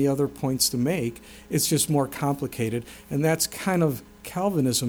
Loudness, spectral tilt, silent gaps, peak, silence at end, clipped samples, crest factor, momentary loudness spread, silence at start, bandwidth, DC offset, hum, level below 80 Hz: -25 LUFS; -4.5 dB/octave; none; -8 dBFS; 0 s; under 0.1%; 16 dB; 10 LU; 0 s; over 20 kHz; under 0.1%; none; -54 dBFS